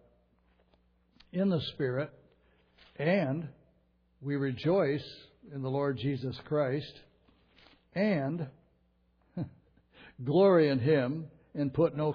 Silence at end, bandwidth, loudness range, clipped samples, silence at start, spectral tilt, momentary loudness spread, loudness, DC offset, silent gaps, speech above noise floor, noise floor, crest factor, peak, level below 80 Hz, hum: 0 s; 5.4 kHz; 6 LU; under 0.1%; 1.35 s; -9.5 dB/octave; 18 LU; -31 LUFS; under 0.1%; none; 41 dB; -70 dBFS; 18 dB; -14 dBFS; -66 dBFS; none